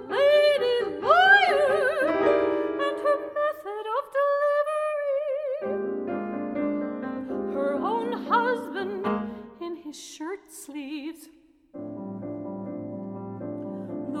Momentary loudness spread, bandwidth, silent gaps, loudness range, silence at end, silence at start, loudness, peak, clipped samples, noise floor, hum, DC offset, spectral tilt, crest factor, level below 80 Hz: 17 LU; 15 kHz; none; 15 LU; 0 s; 0 s; -25 LUFS; -6 dBFS; under 0.1%; -55 dBFS; none; under 0.1%; -4.5 dB/octave; 20 dB; -64 dBFS